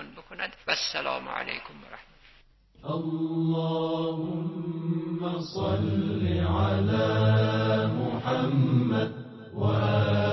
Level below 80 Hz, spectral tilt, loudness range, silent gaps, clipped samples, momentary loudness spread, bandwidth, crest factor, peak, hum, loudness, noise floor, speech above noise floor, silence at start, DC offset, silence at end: -46 dBFS; -7 dB/octave; 6 LU; none; under 0.1%; 12 LU; 6 kHz; 16 dB; -12 dBFS; none; -27 LUFS; -58 dBFS; 32 dB; 0 s; under 0.1%; 0 s